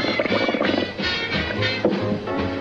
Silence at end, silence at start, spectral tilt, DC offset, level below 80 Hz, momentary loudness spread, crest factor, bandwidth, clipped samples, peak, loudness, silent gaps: 0 s; 0 s; -6 dB/octave; under 0.1%; -44 dBFS; 4 LU; 16 dB; 8.4 kHz; under 0.1%; -8 dBFS; -22 LUFS; none